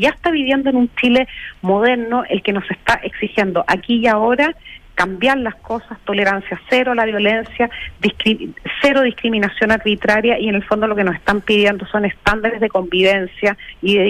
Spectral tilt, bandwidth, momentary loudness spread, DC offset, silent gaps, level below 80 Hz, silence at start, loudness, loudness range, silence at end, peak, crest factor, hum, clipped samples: -5.5 dB/octave; 14.5 kHz; 6 LU; under 0.1%; none; -42 dBFS; 0 s; -16 LUFS; 2 LU; 0 s; -2 dBFS; 14 dB; none; under 0.1%